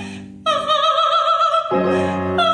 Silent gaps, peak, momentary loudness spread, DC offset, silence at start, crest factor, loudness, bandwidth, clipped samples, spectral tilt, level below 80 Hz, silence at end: none; -6 dBFS; 6 LU; under 0.1%; 0 s; 12 dB; -17 LUFS; 10.5 kHz; under 0.1%; -5 dB/octave; -56 dBFS; 0 s